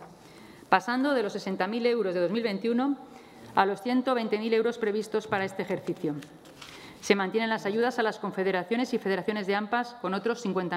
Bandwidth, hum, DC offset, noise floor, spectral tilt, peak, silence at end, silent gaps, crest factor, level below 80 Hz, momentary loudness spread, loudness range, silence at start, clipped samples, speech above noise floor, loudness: 15 kHz; none; under 0.1%; -50 dBFS; -5.5 dB/octave; -6 dBFS; 0 s; none; 22 dB; -72 dBFS; 9 LU; 2 LU; 0 s; under 0.1%; 22 dB; -28 LUFS